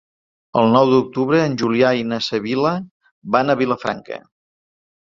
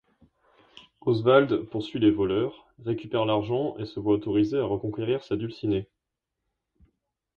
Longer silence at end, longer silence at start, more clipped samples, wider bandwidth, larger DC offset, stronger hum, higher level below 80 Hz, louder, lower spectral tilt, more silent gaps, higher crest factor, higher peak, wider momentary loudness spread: second, 0.85 s vs 1.55 s; second, 0.55 s vs 1.05 s; neither; first, 7.6 kHz vs 6.8 kHz; neither; neither; about the same, -58 dBFS vs -56 dBFS; first, -18 LUFS vs -26 LUFS; second, -6.5 dB/octave vs -8.5 dB/octave; first, 2.91-3.00 s, 3.11-3.22 s vs none; about the same, 18 dB vs 20 dB; first, -2 dBFS vs -6 dBFS; about the same, 12 LU vs 12 LU